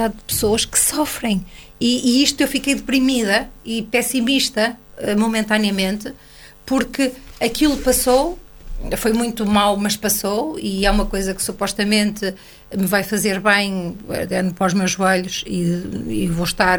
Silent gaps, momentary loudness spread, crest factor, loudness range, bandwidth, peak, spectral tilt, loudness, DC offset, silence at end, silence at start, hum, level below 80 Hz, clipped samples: none; 10 LU; 18 dB; 2 LU; 19.5 kHz; 0 dBFS; -3.5 dB/octave; -19 LUFS; under 0.1%; 0 s; 0 s; none; -36 dBFS; under 0.1%